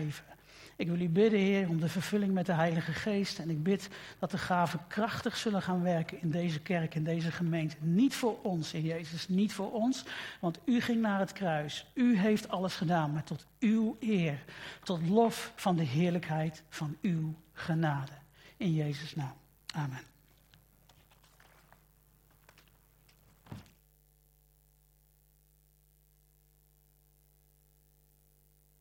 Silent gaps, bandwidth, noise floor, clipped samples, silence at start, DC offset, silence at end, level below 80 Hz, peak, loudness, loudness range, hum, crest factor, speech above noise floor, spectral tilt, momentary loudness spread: none; 16.5 kHz; -67 dBFS; under 0.1%; 0 s; under 0.1%; 5.2 s; -68 dBFS; -14 dBFS; -33 LUFS; 7 LU; 50 Hz at -60 dBFS; 20 dB; 35 dB; -6.5 dB/octave; 12 LU